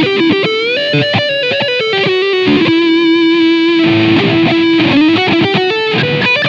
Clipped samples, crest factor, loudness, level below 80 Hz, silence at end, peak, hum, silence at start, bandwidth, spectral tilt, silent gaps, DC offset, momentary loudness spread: under 0.1%; 10 dB; -10 LUFS; -50 dBFS; 0 s; 0 dBFS; none; 0 s; 7.2 kHz; -6.5 dB/octave; none; under 0.1%; 3 LU